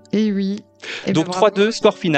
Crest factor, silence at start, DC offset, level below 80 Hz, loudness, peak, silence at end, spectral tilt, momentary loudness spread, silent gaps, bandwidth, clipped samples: 18 dB; 0.15 s; under 0.1%; -62 dBFS; -18 LUFS; 0 dBFS; 0 s; -5.5 dB/octave; 12 LU; none; 9 kHz; under 0.1%